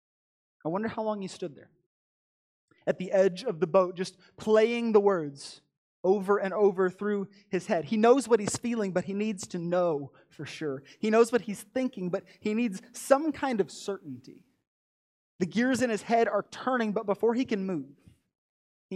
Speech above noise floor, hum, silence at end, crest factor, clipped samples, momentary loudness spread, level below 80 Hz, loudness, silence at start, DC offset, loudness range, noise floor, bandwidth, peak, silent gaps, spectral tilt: over 62 dB; none; 0 s; 22 dB; under 0.1%; 14 LU; -72 dBFS; -28 LUFS; 0.65 s; under 0.1%; 4 LU; under -90 dBFS; 14.5 kHz; -8 dBFS; 1.86-2.68 s, 5.77-6.04 s, 14.67-15.39 s, 18.38-18.89 s; -5.5 dB/octave